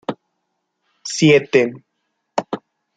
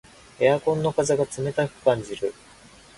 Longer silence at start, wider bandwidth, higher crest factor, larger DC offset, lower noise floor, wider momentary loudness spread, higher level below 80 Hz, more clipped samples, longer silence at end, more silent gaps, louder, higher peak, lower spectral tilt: second, 0.1 s vs 0.4 s; second, 9.4 kHz vs 11.5 kHz; about the same, 20 dB vs 18 dB; neither; first, -73 dBFS vs -50 dBFS; first, 18 LU vs 9 LU; second, -64 dBFS vs -56 dBFS; neither; second, 0.4 s vs 0.65 s; neither; first, -17 LUFS vs -24 LUFS; first, 0 dBFS vs -6 dBFS; about the same, -5 dB/octave vs -5.5 dB/octave